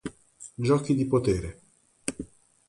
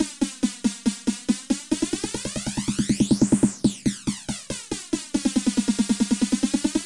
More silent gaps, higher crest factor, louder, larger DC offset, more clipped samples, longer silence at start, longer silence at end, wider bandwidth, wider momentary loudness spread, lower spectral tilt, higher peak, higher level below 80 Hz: neither; about the same, 20 dB vs 16 dB; second, -27 LUFS vs -24 LUFS; neither; neither; about the same, 0.05 s vs 0 s; first, 0.45 s vs 0 s; about the same, 11.5 kHz vs 11.5 kHz; first, 19 LU vs 8 LU; first, -6.5 dB/octave vs -4.5 dB/octave; about the same, -10 dBFS vs -8 dBFS; about the same, -48 dBFS vs -46 dBFS